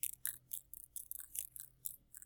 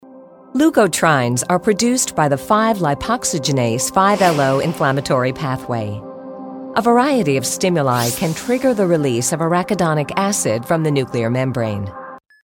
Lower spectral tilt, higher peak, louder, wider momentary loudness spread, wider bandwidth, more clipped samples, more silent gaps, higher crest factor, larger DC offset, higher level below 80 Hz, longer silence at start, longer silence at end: second, 1.5 dB/octave vs -4.5 dB/octave; second, -14 dBFS vs -2 dBFS; second, -45 LUFS vs -17 LUFS; about the same, 7 LU vs 9 LU; first, over 20 kHz vs 17.5 kHz; neither; neither; first, 34 dB vs 16 dB; neither; second, -74 dBFS vs -50 dBFS; about the same, 0.05 s vs 0.05 s; second, 0.05 s vs 0.35 s